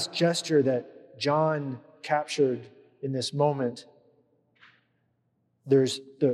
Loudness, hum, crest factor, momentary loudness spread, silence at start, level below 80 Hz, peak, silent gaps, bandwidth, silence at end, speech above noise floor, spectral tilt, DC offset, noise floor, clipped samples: -27 LUFS; none; 18 dB; 14 LU; 0 s; -84 dBFS; -10 dBFS; none; 12.5 kHz; 0 s; 47 dB; -5.5 dB/octave; under 0.1%; -73 dBFS; under 0.1%